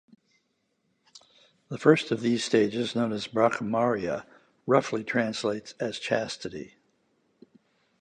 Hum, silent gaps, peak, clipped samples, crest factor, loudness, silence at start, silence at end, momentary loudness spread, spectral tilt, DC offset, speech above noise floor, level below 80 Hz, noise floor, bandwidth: none; none; -4 dBFS; under 0.1%; 24 dB; -27 LUFS; 1.15 s; 1.35 s; 13 LU; -5 dB/octave; under 0.1%; 48 dB; -68 dBFS; -75 dBFS; 10 kHz